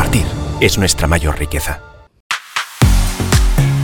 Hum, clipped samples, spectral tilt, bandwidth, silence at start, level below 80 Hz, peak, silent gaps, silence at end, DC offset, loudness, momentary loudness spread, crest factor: none; under 0.1%; -4.5 dB/octave; 18.5 kHz; 0 s; -18 dBFS; 0 dBFS; 2.20-2.30 s; 0 s; under 0.1%; -15 LUFS; 9 LU; 14 dB